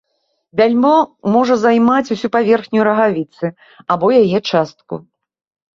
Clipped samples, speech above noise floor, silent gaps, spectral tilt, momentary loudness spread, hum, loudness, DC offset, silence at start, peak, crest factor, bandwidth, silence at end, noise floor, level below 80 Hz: under 0.1%; 53 dB; none; -6.5 dB/octave; 13 LU; none; -14 LUFS; under 0.1%; 0.55 s; 0 dBFS; 14 dB; 7.4 kHz; 0.75 s; -67 dBFS; -58 dBFS